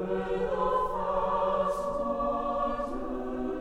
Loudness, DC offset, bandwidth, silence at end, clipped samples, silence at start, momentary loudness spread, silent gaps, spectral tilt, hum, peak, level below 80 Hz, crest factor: -30 LUFS; under 0.1%; 12.5 kHz; 0 s; under 0.1%; 0 s; 6 LU; none; -7 dB/octave; none; -16 dBFS; -46 dBFS; 12 dB